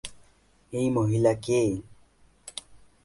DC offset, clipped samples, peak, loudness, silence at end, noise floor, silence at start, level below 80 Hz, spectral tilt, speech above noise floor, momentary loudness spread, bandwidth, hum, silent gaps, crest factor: under 0.1%; under 0.1%; -10 dBFS; -26 LUFS; 0.3 s; -61 dBFS; 0.05 s; -56 dBFS; -6.5 dB/octave; 36 dB; 18 LU; 11.5 kHz; none; none; 20 dB